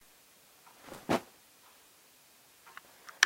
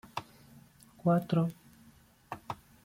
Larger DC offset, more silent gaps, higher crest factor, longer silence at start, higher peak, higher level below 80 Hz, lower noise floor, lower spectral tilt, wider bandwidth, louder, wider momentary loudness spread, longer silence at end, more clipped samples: neither; neither; first, 36 dB vs 18 dB; first, 0.9 s vs 0.15 s; first, -2 dBFS vs -16 dBFS; about the same, -72 dBFS vs -68 dBFS; about the same, -62 dBFS vs -61 dBFS; second, -2 dB/octave vs -8 dB/octave; about the same, 16 kHz vs 16 kHz; second, -38 LUFS vs -33 LUFS; first, 24 LU vs 19 LU; second, 0 s vs 0.3 s; neither